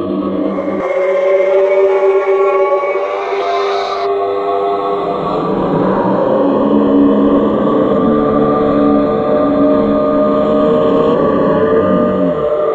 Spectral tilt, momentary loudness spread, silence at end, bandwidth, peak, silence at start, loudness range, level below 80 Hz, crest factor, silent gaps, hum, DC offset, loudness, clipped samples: -8.5 dB/octave; 5 LU; 0 s; 7.2 kHz; 0 dBFS; 0 s; 3 LU; -42 dBFS; 12 dB; none; none; under 0.1%; -13 LUFS; under 0.1%